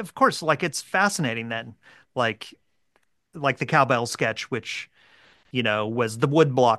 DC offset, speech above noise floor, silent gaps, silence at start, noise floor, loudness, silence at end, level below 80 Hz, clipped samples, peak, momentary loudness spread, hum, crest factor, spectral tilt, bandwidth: under 0.1%; 46 dB; none; 0 s; -70 dBFS; -24 LUFS; 0 s; -68 dBFS; under 0.1%; -4 dBFS; 13 LU; none; 22 dB; -4.5 dB/octave; 12.5 kHz